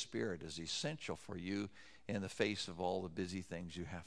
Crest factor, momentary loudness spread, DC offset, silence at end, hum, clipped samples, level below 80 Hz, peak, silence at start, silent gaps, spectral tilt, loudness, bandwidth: 24 dB; 8 LU; under 0.1%; 0 s; none; under 0.1%; -68 dBFS; -20 dBFS; 0 s; none; -4.5 dB/octave; -43 LUFS; 11 kHz